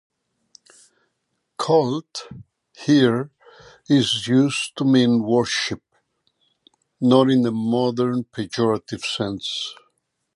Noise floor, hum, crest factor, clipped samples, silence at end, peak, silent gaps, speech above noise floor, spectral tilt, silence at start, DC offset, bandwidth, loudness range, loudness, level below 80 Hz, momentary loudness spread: -74 dBFS; none; 20 dB; under 0.1%; 0.6 s; -2 dBFS; none; 55 dB; -5.5 dB/octave; 1.6 s; under 0.1%; 11.5 kHz; 4 LU; -20 LUFS; -62 dBFS; 13 LU